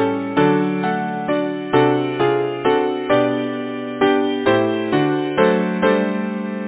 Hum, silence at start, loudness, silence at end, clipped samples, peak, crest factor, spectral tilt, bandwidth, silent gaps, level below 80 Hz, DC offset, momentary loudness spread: none; 0 s; -18 LUFS; 0 s; under 0.1%; 0 dBFS; 18 dB; -10.5 dB/octave; 4 kHz; none; -56 dBFS; under 0.1%; 6 LU